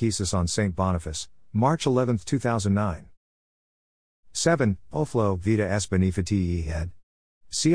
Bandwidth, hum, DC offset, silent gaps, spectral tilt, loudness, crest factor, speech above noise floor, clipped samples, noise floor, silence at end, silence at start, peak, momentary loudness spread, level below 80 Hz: 10.5 kHz; none; 0.4%; 3.17-4.23 s, 7.03-7.41 s; -5.5 dB/octave; -25 LUFS; 18 dB; over 66 dB; under 0.1%; under -90 dBFS; 0 s; 0 s; -8 dBFS; 9 LU; -42 dBFS